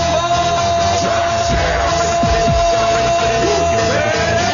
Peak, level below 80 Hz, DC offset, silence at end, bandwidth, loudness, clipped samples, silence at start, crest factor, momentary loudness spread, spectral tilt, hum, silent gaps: -4 dBFS; -28 dBFS; under 0.1%; 0 s; 7.4 kHz; -15 LUFS; under 0.1%; 0 s; 10 dB; 2 LU; -3.5 dB/octave; none; none